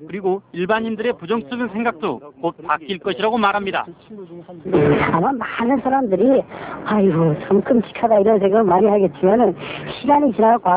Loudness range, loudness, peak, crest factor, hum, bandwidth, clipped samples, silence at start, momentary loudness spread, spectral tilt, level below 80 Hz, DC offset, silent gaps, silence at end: 6 LU; -18 LUFS; -4 dBFS; 14 dB; none; 4 kHz; under 0.1%; 0 s; 12 LU; -11 dB/octave; -50 dBFS; under 0.1%; none; 0 s